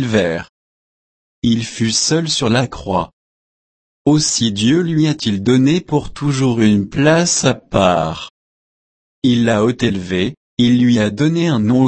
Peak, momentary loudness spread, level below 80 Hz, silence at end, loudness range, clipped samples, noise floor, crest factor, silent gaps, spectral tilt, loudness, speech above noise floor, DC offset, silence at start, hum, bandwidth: 0 dBFS; 8 LU; -44 dBFS; 0 s; 4 LU; under 0.1%; under -90 dBFS; 16 dB; 0.49-1.42 s, 3.13-4.05 s, 8.30-9.22 s, 10.37-10.57 s; -5 dB/octave; -15 LUFS; over 76 dB; under 0.1%; 0 s; none; 8.8 kHz